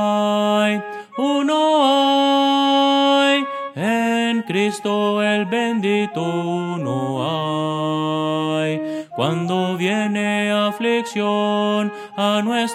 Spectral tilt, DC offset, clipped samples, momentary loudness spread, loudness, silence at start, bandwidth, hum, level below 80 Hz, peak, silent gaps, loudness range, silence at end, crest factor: -5 dB/octave; under 0.1%; under 0.1%; 8 LU; -19 LUFS; 0 s; 14 kHz; none; -72 dBFS; -4 dBFS; none; 5 LU; 0 s; 16 dB